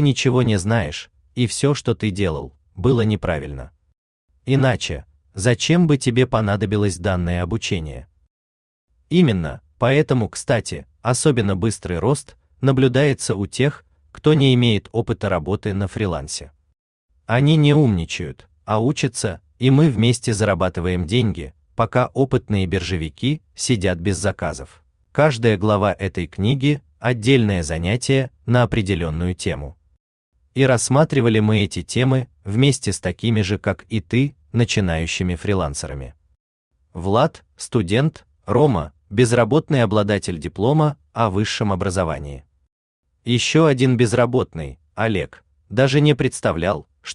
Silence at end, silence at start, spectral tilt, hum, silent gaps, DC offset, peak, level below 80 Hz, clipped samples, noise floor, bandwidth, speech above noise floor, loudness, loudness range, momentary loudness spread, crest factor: 0 s; 0 s; -6 dB/octave; none; 3.98-4.28 s, 8.30-8.88 s, 16.79-17.08 s, 30.00-30.32 s, 36.40-36.71 s, 42.72-43.03 s; under 0.1%; -2 dBFS; -44 dBFS; under 0.1%; under -90 dBFS; 11 kHz; over 72 dB; -19 LUFS; 4 LU; 12 LU; 18 dB